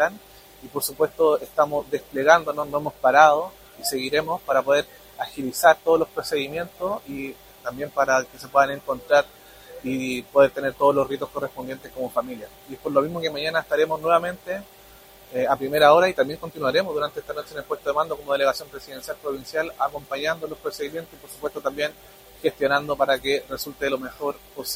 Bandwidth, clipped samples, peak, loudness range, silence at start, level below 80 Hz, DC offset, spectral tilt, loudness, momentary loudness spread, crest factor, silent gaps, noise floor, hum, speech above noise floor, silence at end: 16 kHz; under 0.1%; -2 dBFS; 7 LU; 0 s; -56 dBFS; under 0.1%; -3.5 dB/octave; -23 LUFS; 16 LU; 22 dB; none; -48 dBFS; none; 25 dB; 0 s